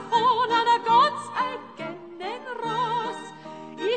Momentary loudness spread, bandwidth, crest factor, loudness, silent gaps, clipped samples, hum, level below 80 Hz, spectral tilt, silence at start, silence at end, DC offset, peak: 17 LU; 9.2 kHz; 16 dB; -24 LUFS; none; under 0.1%; none; -78 dBFS; -4 dB/octave; 0 s; 0 s; under 0.1%; -8 dBFS